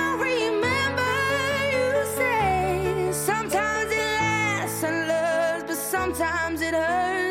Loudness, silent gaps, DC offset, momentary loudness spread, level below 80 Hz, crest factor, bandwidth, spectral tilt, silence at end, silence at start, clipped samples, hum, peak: -24 LUFS; none; under 0.1%; 3 LU; -48 dBFS; 12 dB; 16 kHz; -4 dB/octave; 0 s; 0 s; under 0.1%; none; -12 dBFS